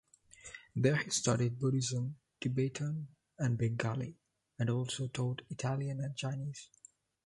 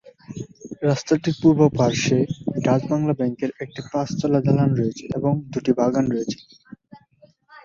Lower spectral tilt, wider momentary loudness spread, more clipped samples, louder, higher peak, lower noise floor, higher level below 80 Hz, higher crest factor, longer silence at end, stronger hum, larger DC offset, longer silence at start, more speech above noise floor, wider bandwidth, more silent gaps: second, -5 dB/octave vs -7 dB/octave; about the same, 13 LU vs 15 LU; neither; second, -36 LUFS vs -21 LUFS; second, -16 dBFS vs -2 dBFS; about the same, -57 dBFS vs -56 dBFS; second, -68 dBFS vs -54 dBFS; about the same, 20 dB vs 20 dB; first, 0.6 s vs 0.05 s; neither; neither; first, 0.45 s vs 0.05 s; second, 22 dB vs 35 dB; first, 11.5 kHz vs 7.6 kHz; neither